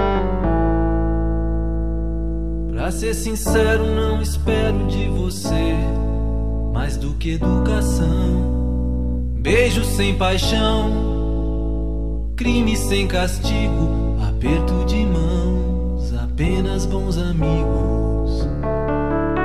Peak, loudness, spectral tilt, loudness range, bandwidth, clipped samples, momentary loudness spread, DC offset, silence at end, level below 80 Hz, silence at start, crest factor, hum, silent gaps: -4 dBFS; -20 LUFS; -6 dB/octave; 2 LU; 14.5 kHz; under 0.1%; 6 LU; 3%; 0 s; -22 dBFS; 0 s; 14 dB; none; none